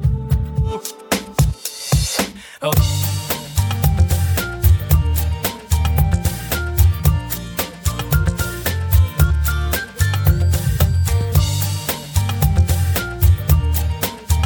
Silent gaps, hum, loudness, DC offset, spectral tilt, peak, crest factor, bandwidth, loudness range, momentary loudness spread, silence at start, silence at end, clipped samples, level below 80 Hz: none; none; -18 LUFS; under 0.1%; -5 dB/octave; -4 dBFS; 14 dB; over 20 kHz; 2 LU; 6 LU; 0 s; 0 s; under 0.1%; -22 dBFS